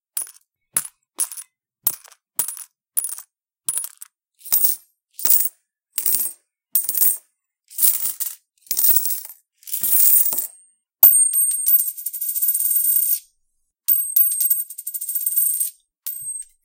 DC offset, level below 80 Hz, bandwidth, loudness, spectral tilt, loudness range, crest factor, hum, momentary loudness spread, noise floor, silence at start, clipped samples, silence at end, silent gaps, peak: under 0.1%; -78 dBFS; 17.5 kHz; -17 LUFS; 2 dB/octave; 11 LU; 22 dB; none; 15 LU; -70 dBFS; 0.15 s; under 0.1%; 0.2 s; none; 0 dBFS